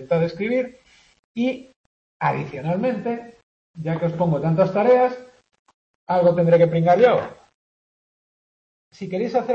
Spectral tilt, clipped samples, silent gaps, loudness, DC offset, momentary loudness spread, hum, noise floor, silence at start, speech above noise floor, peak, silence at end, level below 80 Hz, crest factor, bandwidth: -8.5 dB/octave; under 0.1%; 1.19-1.35 s, 1.76-2.20 s, 3.43-3.74 s, 5.59-5.65 s, 5.74-6.07 s, 7.54-8.91 s; -20 LUFS; under 0.1%; 16 LU; none; under -90 dBFS; 0 s; over 70 dB; -4 dBFS; 0 s; -60 dBFS; 18 dB; 6.8 kHz